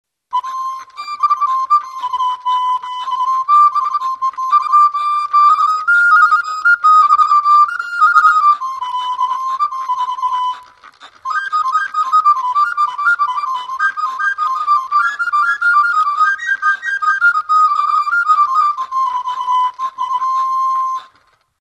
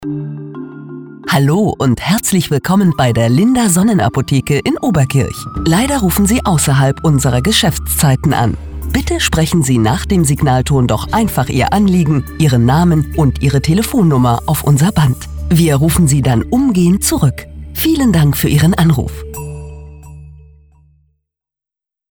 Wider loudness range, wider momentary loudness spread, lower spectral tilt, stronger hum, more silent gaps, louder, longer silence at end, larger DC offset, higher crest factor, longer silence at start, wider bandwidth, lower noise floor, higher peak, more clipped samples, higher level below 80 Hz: first, 7 LU vs 3 LU; about the same, 11 LU vs 11 LU; second, 2 dB/octave vs -5.5 dB/octave; neither; neither; about the same, -14 LUFS vs -12 LUFS; second, 0.55 s vs 1.75 s; neither; about the same, 14 dB vs 12 dB; first, 0.3 s vs 0 s; second, 9 kHz vs over 20 kHz; second, -55 dBFS vs -87 dBFS; about the same, 0 dBFS vs 0 dBFS; neither; second, -70 dBFS vs -28 dBFS